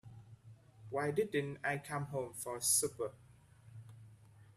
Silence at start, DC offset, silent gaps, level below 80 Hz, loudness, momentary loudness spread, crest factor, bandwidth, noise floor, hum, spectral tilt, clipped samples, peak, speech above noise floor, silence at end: 0.05 s; under 0.1%; none; -74 dBFS; -37 LUFS; 26 LU; 22 dB; 15 kHz; -61 dBFS; none; -3 dB/octave; under 0.1%; -18 dBFS; 24 dB; 0.1 s